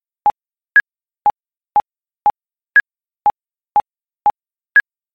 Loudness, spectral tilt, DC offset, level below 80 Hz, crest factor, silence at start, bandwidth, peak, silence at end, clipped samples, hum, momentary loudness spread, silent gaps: -17 LUFS; -4 dB/octave; under 0.1%; -58 dBFS; 16 dB; 0.25 s; 5.2 kHz; -2 dBFS; 0.35 s; under 0.1%; none; 6 LU; none